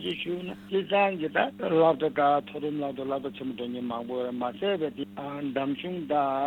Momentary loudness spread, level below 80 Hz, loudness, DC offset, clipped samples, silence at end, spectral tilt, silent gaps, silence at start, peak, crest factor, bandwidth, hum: 10 LU; -68 dBFS; -29 LUFS; under 0.1%; under 0.1%; 0 s; -7.5 dB/octave; none; 0 s; -10 dBFS; 18 dB; 17.5 kHz; none